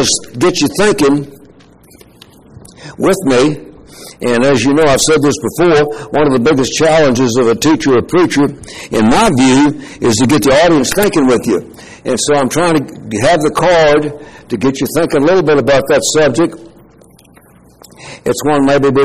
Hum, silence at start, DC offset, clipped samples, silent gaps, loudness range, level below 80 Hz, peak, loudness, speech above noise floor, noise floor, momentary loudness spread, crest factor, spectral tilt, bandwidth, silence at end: none; 0 s; 1%; under 0.1%; none; 4 LU; -38 dBFS; 0 dBFS; -11 LUFS; 32 dB; -43 dBFS; 8 LU; 12 dB; -4.5 dB/octave; 15.5 kHz; 0 s